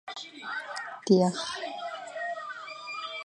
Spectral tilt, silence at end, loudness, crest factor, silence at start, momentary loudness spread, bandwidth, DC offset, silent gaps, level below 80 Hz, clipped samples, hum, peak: -5 dB/octave; 0 s; -31 LUFS; 22 dB; 0.05 s; 15 LU; 11 kHz; under 0.1%; none; -76 dBFS; under 0.1%; none; -10 dBFS